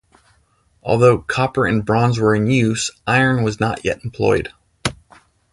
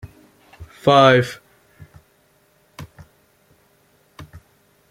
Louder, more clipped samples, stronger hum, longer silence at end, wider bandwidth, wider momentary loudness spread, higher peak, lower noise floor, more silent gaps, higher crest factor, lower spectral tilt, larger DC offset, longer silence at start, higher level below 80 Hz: second, -18 LUFS vs -15 LUFS; neither; neither; about the same, 0.6 s vs 0.7 s; second, 11.5 kHz vs 16 kHz; second, 11 LU vs 29 LU; about the same, 0 dBFS vs 0 dBFS; about the same, -59 dBFS vs -59 dBFS; neither; about the same, 18 dB vs 22 dB; about the same, -5.5 dB/octave vs -6 dB/octave; neither; first, 0.85 s vs 0.6 s; first, -44 dBFS vs -56 dBFS